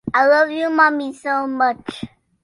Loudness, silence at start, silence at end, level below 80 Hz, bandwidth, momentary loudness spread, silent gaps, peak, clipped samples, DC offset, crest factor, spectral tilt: -17 LUFS; 0.05 s; 0.35 s; -58 dBFS; 11.5 kHz; 17 LU; none; -2 dBFS; under 0.1%; under 0.1%; 16 dB; -5 dB/octave